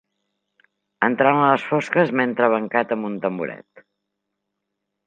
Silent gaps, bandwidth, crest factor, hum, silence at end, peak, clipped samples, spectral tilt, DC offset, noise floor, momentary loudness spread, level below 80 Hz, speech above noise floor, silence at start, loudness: none; 9.2 kHz; 22 dB; none; 1.5 s; -2 dBFS; under 0.1%; -7 dB/octave; under 0.1%; -79 dBFS; 10 LU; -74 dBFS; 60 dB; 1 s; -20 LUFS